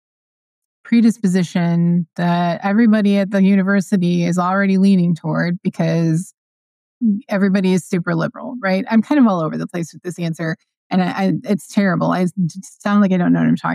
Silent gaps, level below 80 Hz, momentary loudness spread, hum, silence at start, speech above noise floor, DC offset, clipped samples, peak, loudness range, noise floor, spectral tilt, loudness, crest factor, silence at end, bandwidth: 6.38-7.01 s, 10.77-10.90 s; -72 dBFS; 10 LU; none; 0.85 s; over 74 dB; under 0.1%; under 0.1%; -4 dBFS; 4 LU; under -90 dBFS; -7.5 dB/octave; -17 LUFS; 12 dB; 0 s; 12 kHz